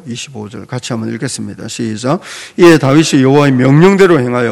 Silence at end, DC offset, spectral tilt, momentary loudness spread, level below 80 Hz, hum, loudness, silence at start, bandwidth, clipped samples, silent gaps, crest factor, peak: 0 s; under 0.1%; -6 dB/octave; 17 LU; -48 dBFS; none; -10 LUFS; 0.05 s; 14 kHz; 3%; none; 10 dB; 0 dBFS